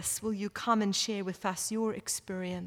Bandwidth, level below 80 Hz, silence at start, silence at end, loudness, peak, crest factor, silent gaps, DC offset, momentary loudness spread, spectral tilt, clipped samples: 18 kHz; -66 dBFS; 0 s; 0 s; -32 LUFS; -14 dBFS; 18 dB; none; under 0.1%; 7 LU; -3.5 dB/octave; under 0.1%